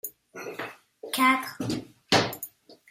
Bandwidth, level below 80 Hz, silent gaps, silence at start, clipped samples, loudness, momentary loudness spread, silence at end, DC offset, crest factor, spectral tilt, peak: 16 kHz; -64 dBFS; none; 0.05 s; under 0.1%; -26 LUFS; 18 LU; 0.15 s; under 0.1%; 22 dB; -3.5 dB/octave; -8 dBFS